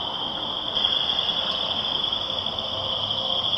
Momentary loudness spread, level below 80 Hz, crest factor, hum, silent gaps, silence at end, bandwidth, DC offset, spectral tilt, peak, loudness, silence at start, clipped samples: 5 LU; -52 dBFS; 18 dB; none; none; 0 s; 14 kHz; under 0.1%; -3.5 dB/octave; -8 dBFS; -23 LUFS; 0 s; under 0.1%